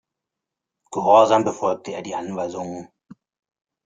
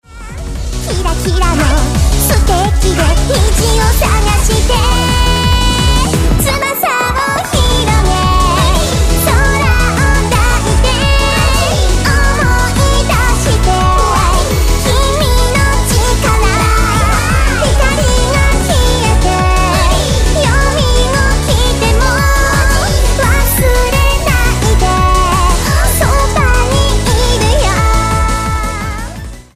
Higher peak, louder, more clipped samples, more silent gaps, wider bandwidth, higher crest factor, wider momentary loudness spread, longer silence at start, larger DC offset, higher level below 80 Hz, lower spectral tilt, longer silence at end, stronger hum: about the same, -2 dBFS vs 0 dBFS; second, -20 LUFS vs -11 LUFS; neither; neither; second, 9.2 kHz vs 15.5 kHz; first, 20 dB vs 10 dB; first, 17 LU vs 2 LU; first, 0.9 s vs 0.1 s; neither; second, -68 dBFS vs -14 dBFS; about the same, -5 dB/octave vs -4 dB/octave; first, 1 s vs 0.15 s; neither